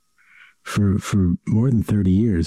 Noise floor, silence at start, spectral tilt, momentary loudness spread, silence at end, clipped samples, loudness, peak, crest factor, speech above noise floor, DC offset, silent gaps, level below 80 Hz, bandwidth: -52 dBFS; 0.65 s; -7.5 dB/octave; 5 LU; 0 s; under 0.1%; -20 LUFS; -10 dBFS; 10 dB; 34 dB; under 0.1%; none; -40 dBFS; 14 kHz